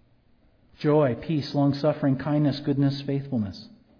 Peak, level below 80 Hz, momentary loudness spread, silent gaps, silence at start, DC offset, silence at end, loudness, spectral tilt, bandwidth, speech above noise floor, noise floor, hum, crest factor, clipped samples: -10 dBFS; -58 dBFS; 7 LU; none; 0.8 s; under 0.1%; 0.3 s; -25 LUFS; -9 dB/octave; 5.4 kHz; 36 dB; -60 dBFS; none; 16 dB; under 0.1%